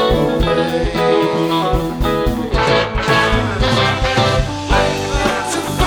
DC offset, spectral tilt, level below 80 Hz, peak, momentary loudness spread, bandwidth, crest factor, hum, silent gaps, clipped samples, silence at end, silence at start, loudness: under 0.1%; -5 dB/octave; -24 dBFS; 0 dBFS; 4 LU; over 20 kHz; 14 dB; none; none; under 0.1%; 0 s; 0 s; -16 LUFS